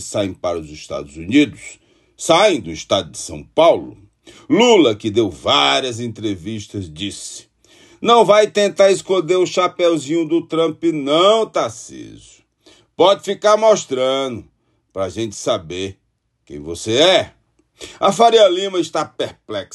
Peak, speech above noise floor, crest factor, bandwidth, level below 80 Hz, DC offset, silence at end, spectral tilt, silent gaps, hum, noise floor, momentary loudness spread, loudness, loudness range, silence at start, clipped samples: 0 dBFS; 44 dB; 16 dB; 12 kHz; -52 dBFS; under 0.1%; 0.1 s; -4 dB/octave; none; none; -61 dBFS; 17 LU; -16 LUFS; 4 LU; 0 s; under 0.1%